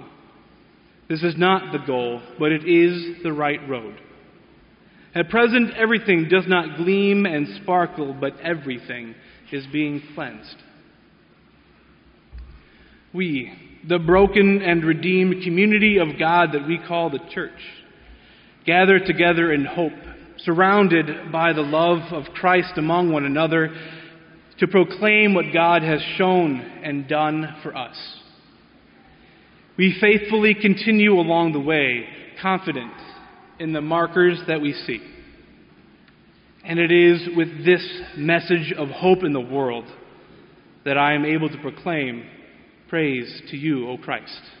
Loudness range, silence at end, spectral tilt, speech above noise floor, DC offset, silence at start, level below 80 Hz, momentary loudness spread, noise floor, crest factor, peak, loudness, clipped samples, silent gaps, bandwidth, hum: 8 LU; 0.1 s; -4 dB/octave; 34 dB; under 0.1%; 0 s; -52 dBFS; 16 LU; -54 dBFS; 18 dB; -4 dBFS; -20 LUFS; under 0.1%; none; 5.4 kHz; none